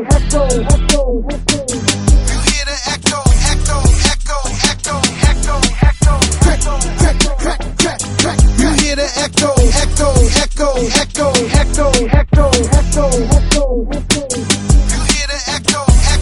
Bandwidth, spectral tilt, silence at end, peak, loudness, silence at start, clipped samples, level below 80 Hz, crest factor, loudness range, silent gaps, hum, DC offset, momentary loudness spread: 12 kHz; -4 dB/octave; 0 s; 0 dBFS; -13 LUFS; 0 s; under 0.1%; -14 dBFS; 12 dB; 1 LU; none; none; under 0.1%; 4 LU